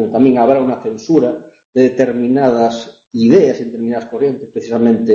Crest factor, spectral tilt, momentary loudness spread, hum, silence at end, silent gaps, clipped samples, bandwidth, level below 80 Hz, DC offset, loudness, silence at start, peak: 12 dB; -7 dB/octave; 10 LU; none; 0 s; 1.65-1.73 s, 3.07-3.11 s; under 0.1%; 7.4 kHz; -54 dBFS; under 0.1%; -13 LUFS; 0 s; 0 dBFS